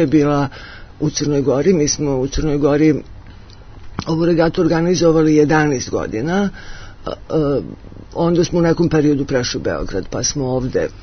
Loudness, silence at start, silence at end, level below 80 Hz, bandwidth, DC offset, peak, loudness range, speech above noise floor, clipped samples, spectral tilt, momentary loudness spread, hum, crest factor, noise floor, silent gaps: -17 LUFS; 0 s; 0 s; -34 dBFS; 6.6 kHz; under 0.1%; -2 dBFS; 2 LU; 21 dB; under 0.1%; -5.5 dB/octave; 16 LU; none; 16 dB; -37 dBFS; none